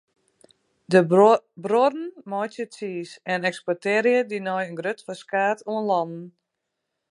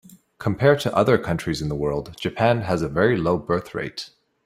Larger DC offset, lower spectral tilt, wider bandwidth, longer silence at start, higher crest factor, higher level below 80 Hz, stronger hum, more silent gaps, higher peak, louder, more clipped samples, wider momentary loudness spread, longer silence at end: neither; about the same, -6 dB/octave vs -6.5 dB/octave; second, 11.5 kHz vs 15.5 kHz; first, 0.9 s vs 0.1 s; about the same, 20 dB vs 18 dB; second, -78 dBFS vs -48 dBFS; neither; neither; about the same, -4 dBFS vs -4 dBFS; about the same, -23 LUFS vs -22 LUFS; neither; first, 15 LU vs 11 LU; first, 0.8 s vs 0.4 s